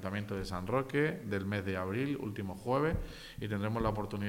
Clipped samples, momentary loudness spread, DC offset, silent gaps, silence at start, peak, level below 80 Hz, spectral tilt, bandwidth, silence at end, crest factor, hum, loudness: under 0.1%; 8 LU; under 0.1%; none; 0 s; -18 dBFS; -50 dBFS; -7 dB/octave; 16.5 kHz; 0 s; 16 dB; none; -35 LUFS